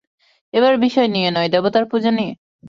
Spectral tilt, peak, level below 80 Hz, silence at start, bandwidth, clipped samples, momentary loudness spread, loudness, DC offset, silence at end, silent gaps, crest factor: -6.5 dB/octave; -4 dBFS; -62 dBFS; 0.55 s; 7.4 kHz; under 0.1%; 7 LU; -17 LUFS; under 0.1%; 0 s; 2.38-2.59 s; 14 dB